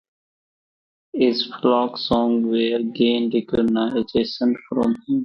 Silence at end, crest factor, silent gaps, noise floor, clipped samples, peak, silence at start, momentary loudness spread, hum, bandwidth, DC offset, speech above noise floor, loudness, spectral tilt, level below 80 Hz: 0 s; 16 dB; none; under -90 dBFS; under 0.1%; -4 dBFS; 1.15 s; 3 LU; none; 6.2 kHz; under 0.1%; over 70 dB; -21 LUFS; -7 dB/octave; -54 dBFS